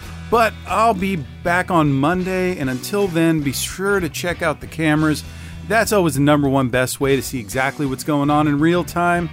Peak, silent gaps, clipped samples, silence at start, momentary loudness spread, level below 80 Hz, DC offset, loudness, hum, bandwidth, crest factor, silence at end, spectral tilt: -4 dBFS; none; under 0.1%; 0 s; 7 LU; -42 dBFS; under 0.1%; -18 LUFS; none; 16 kHz; 14 dB; 0 s; -5.5 dB/octave